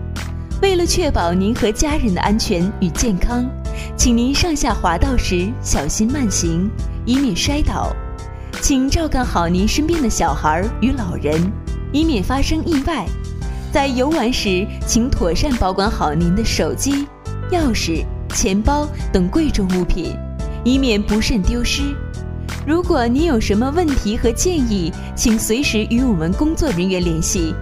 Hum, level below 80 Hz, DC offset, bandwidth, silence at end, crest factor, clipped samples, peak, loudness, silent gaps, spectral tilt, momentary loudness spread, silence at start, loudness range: none; -24 dBFS; under 0.1%; 16 kHz; 0 s; 18 dB; under 0.1%; 0 dBFS; -18 LUFS; none; -5 dB/octave; 8 LU; 0 s; 2 LU